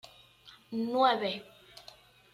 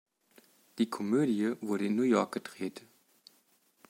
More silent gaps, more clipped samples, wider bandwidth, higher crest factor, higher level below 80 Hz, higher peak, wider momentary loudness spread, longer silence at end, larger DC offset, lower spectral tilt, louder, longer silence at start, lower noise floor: neither; neither; about the same, 15 kHz vs 16.5 kHz; about the same, 22 dB vs 20 dB; first, -76 dBFS vs -84 dBFS; about the same, -12 dBFS vs -12 dBFS; first, 25 LU vs 13 LU; second, 0.55 s vs 1.1 s; neither; about the same, -5 dB/octave vs -6 dB/octave; about the same, -30 LUFS vs -31 LUFS; second, 0.05 s vs 0.75 s; second, -58 dBFS vs -69 dBFS